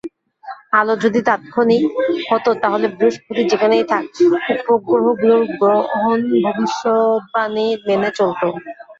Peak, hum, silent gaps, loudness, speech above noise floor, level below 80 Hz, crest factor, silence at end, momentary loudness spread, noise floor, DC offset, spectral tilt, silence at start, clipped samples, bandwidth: -2 dBFS; none; none; -16 LUFS; 20 dB; -62 dBFS; 14 dB; 0.05 s; 5 LU; -36 dBFS; under 0.1%; -5.5 dB/octave; 0.05 s; under 0.1%; 7.6 kHz